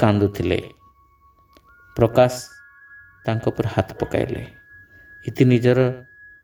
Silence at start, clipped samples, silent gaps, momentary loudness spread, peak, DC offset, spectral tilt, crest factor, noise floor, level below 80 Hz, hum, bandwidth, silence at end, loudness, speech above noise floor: 0 s; under 0.1%; none; 18 LU; -2 dBFS; under 0.1%; -7.5 dB/octave; 20 dB; -55 dBFS; -46 dBFS; none; over 20 kHz; 0.4 s; -20 LUFS; 36 dB